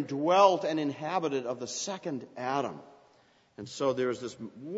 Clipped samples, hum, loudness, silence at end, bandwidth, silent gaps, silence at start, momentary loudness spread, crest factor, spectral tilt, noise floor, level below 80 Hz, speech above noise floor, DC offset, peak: under 0.1%; none; -30 LUFS; 0 s; 8 kHz; none; 0 s; 19 LU; 22 dB; -4.5 dB/octave; -64 dBFS; -78 dBFS; 34 dB; under 0.1%; -10 dBFS